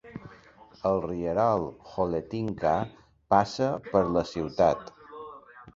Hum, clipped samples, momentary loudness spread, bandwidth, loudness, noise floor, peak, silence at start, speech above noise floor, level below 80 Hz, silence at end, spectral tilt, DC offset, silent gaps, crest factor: none; under 0.1%; 20 LU; 7.8 kHz; -27 LUFS; -54 dBFS; -6 dBFS; 0.05 s; 27 dB; -54 dBFS; 0.05 s; -7 dB/octave; under 0.1%; none; 22 dB